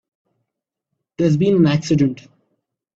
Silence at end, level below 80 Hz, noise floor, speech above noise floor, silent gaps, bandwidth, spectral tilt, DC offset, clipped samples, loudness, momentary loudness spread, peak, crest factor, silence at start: 0.8 s; -54 dBFS; -81 dBFS; 65 dB; none; 7.8 kHz; -7.5 dB/octave; under 0.1%; under 0.1%; -17 LUFS; 6 LU; -4 dBFS; 16 dB; 1.2 s